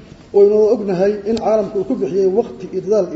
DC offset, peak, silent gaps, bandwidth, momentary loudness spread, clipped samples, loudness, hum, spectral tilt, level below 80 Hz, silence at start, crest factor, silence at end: under 0.1%; -2 dBFS; none; 7.8 kHz; 8 LU; under 0.1%; -16 LUFS; none; -7.5 dB/octave; -50 dBFS; 0.1 s; 14 dB; 0 s